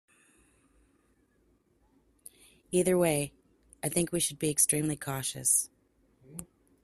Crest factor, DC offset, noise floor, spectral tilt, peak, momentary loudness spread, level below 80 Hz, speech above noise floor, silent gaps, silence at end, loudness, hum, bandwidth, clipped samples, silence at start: 24 dB; under 0.1%; -69 dBFS; -3.5 dB/octave; -10 dBFS; 19 LU; -64 dBFS; 40 dB; none; 0.4 s; -28 LUFS; none; 15 kHz; under 0.1%; 2.7 s